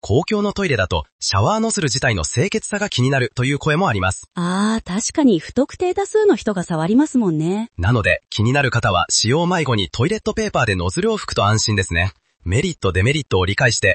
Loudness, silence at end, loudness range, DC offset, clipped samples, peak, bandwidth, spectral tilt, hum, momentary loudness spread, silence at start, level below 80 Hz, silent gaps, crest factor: -18 LUFS; 0 s; 1 LU; under 0.1%; under 0.1%; -2 dBFS; 8.8 kHz; -4.5 dB/octave; none; 5 LU; 0.05 s; -42 dBFS; 1.12-1.19 s; 16 dB